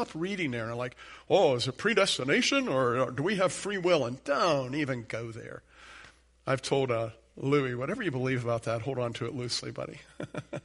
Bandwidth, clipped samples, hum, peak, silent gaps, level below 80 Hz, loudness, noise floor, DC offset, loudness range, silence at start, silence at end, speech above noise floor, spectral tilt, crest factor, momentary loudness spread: 11.5 kHz; under 0.1%; none; -12 dBFS; none; -62 dBFS; -29 LUFS; -55 dBFS; under 0.1%; 5 LU; 0 s; 0.05 s; 25 dB; -4.5 dB/octave; 18 dB; 15 LU